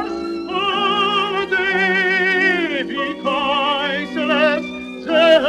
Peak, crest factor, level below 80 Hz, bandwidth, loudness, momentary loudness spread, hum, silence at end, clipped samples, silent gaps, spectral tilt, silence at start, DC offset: 0 dBFS; 18 dB; -54 dBFS; 11.5 kHz; -17 LUFS; 8 LU; none; 0 s; under 0.1%; none; -4.5 dB/octave; 0 s; under 0.1%